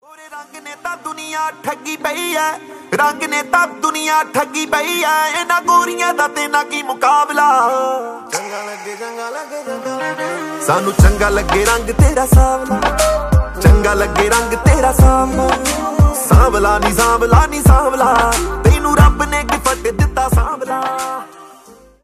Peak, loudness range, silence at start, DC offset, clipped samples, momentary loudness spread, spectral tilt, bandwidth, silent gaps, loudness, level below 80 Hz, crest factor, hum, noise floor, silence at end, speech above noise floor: 0 dBFS; 6 LU; 0.2 s; under 0.1%; under 0.1%; 14 LU; -5 dB/octave; 15.5 kHz; none; -14 LUFS; -20 dBFS; 14 dB; none; -43 dBFS; 0.55 s; 29 dB